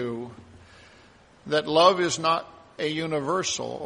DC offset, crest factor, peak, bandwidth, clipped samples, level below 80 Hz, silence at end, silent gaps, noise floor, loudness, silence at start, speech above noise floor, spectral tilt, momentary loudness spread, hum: under 0.1%; 22 dB; -4 dBFS; 10.5 kHz; under 0.1%; -64 dBFS; 0 s; none; -54 dBFS; -24 LUFS; 0 s; 30 dB; -3.5 dB/octave; 16 LU; none